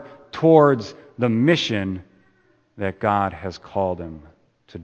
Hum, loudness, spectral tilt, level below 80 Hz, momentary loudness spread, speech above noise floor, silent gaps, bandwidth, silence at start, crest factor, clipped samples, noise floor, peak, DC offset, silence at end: none; -20 LUFS; -6.5 dB/octave; -54 dBFS; 21 LU; 41 dB; none; 8.4 kHz; 0 s; 22 dB; under 0.1%; -60 dBFS; 0 dBFS; under 0.1%; 0 s